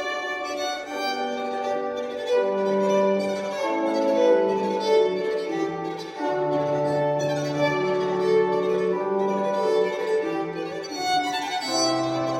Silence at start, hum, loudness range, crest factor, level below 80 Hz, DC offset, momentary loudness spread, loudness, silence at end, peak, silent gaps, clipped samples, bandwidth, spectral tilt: 0 s; none; 2 LU; 16 dB; -68 dBFS; under 0.1%; 7 LU; -24 LUFS; 0 s; -8 dBFS; none; under 0.1%; 16 kHz; -4.5 dB/octave